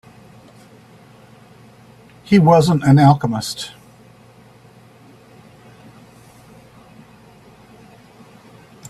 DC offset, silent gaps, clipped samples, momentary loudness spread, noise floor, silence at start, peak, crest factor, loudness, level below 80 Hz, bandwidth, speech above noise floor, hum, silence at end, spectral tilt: under 0.1%; none; under 0.1%; 16 LU; -46 dBFS; 2.3 s; 0 dBFS; 20 dB; -14 LUFS; -54 dBFS; 13.5 kHz; 34 dB; none; 5.2 s; -7 dB/octave